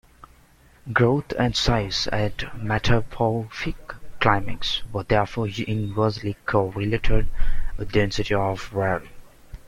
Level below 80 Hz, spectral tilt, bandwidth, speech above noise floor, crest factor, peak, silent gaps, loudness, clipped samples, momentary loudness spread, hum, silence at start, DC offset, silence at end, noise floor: -30 dBFS; -5.5 dB/octave; 9.4 kHz; 32 dB; 20 dB; -2 dBFS; none; -24 LUFS; under 0.1%; 10 LU; none; 0.85 s; under 0.1%; 0 s; -54 dBFS